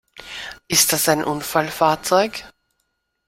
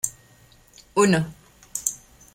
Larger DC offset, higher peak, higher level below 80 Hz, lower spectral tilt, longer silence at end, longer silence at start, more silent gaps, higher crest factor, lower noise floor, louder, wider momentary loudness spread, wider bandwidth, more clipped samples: neither; about the same, -2 dBFS vs -4 dBFS; about the same, -54 dBFS vs -56 dBFS; second, -2.5 dB/octave vs -4.5 dB/octave; first, 0.8 s vs 0.4 s; about the same, 0.15 s vs 0.05 s; neither; about the same, 20 dB vs 22 dB; first, -72 dBFS vs -54 dBFS; first, -18 LUFS vs -24 LUFS; about the same, 17 LU vs 15 LU; about the same, 16.5 kHz vs 16.5 kHz; neither